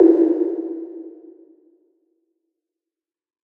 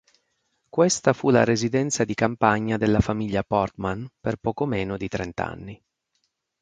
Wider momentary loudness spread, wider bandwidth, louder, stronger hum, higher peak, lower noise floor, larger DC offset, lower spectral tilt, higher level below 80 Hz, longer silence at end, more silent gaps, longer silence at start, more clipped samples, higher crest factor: first, 22 LU vs 11 LU; second, 2.2 kHz vs 9.6 kHz; first, -20 LUFS vs -24 LUFS; neither; about the same, -2 dBFS vs -2 dBFS; first, -89 dBFS vs -74 dBFS; neither; first, -9 dB/octave vs -5 dB/octave; second, -80 dBFS vs -44 dBFS; first, 2.35 s vs 0.85 s; neither; second, 0 s vs 0.75 s; neither; about the same, 20 dB vs 22 dB